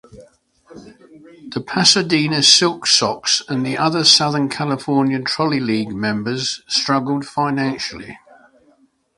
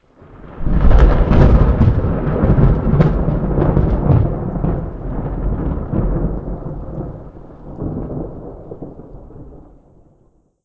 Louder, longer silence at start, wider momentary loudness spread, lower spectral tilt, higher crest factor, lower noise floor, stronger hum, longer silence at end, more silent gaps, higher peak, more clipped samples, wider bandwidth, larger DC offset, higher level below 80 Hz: about the same, -16 LUFS vs -17 LUFS; second, 0.15 s vs 0.3 s; second, 11 LU vs 21 LU; second, -3 dB/octave vs -10.5 dB/octave; about the same, 18 dB vs 16 dB; about the same, -57 dBFS vs -55 dBFS; neither; about the same, 1 s vs 1.05 s; neither; about the same, 0 dBFS vs 0 dBFS; neither; first, 11.5 kHz vs 5 kHz; neither; second, -58 dBFS vs -20 dBFS